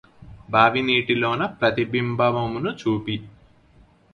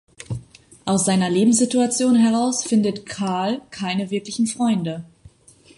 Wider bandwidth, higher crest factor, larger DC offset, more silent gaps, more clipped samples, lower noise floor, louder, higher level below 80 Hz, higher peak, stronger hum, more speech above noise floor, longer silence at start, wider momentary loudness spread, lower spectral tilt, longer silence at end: second, 7 kHz vs 11.5 kHz; about the same, 20 dB vs 16 dB; neither; neither; neither; about the same, -54 dBFS vs -51 dBFS; about the same, -22 LUFS vs -20 LUFS; about the same, -54 dBFS vs -56 dBFS; first, -2 dBFS vs -6 dBFS; neither; about the same, 33 dB vs 32 dB; about the same, 0.2 s vs 0.2 s; second, 9 LU vs 15 LU; first, -7 dB/octave vs -4.5 dB/octave; first, 0.85 s vs 0.7 s